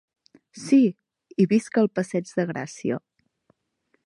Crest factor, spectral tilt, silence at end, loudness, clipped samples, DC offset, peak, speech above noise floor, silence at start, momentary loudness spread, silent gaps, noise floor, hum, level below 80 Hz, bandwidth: 18 dB; -7 dB/octave; 1.1 s; -24 LUFS; under 0.1%; under 0.1%; -8 dBFS; 49 dB; 0.55 s; 12 LU; none; -71 dBFS; none; -72 dBFS; 11.5 kHz